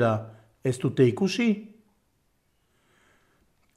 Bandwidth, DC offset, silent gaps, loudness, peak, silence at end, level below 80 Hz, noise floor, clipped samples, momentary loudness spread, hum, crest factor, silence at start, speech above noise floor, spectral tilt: 12.5 kHz; under 0.1%; none; -26 LUFS; -10 dBFS; 2.1 s; -70 dBFS; -71 dBFS; under 0.1%; 10 LU; none; 20 dB; 0 s; 47 dB; -6.5 dB/octave